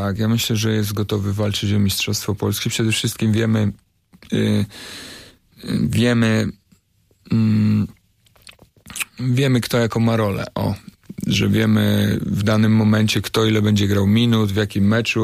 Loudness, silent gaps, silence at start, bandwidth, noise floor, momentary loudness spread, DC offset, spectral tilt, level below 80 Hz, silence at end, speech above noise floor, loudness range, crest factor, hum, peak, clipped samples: -19 LUFS; none; 0 s; 15.5 kHz; -60 dBFS; 11 LU; under 0.1%; -5.5 dB/octave; -48 dBFS; 0 s; 42 dB; 5 LU; 14 dB; none; -6 dBFS; under 0.1%